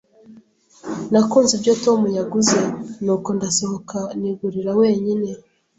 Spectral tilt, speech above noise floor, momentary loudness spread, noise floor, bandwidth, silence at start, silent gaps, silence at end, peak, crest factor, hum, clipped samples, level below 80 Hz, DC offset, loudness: -4.5 dB/octave; 31 dB; 12 LU; -50 dBFS; 8.4 kHz; 0.3 s; none; 0.4 s; -4 dBFS; 16 dB; none; under 0.1%; -60 dBFS; under 0.1%; -19 LUFS